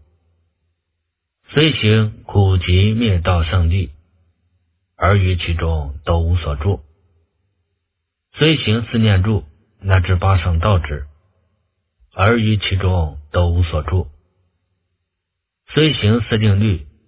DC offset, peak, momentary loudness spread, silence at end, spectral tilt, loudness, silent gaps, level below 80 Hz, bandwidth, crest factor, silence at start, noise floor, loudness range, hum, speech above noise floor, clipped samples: under 0.1%; 0 dBFS; 8 LU; 0.2 s; -11 dB/octave; -17 LUFS; none; -26 dBFS; 4 kHz; 18 dB; 1.5 s; -78 dBFS; 4 LU; none; 63 dB; under 0.1%